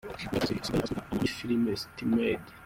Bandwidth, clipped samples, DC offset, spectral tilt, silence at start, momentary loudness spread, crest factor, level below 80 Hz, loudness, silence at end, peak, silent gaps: 16.5 kHz; under 0.1%; under 0.1%; -5.5 dB/octave; 0.05 s; 5 LU; 16 dB; -52 dBFS; -31 LUFS; 0 s; -16 dBFS; none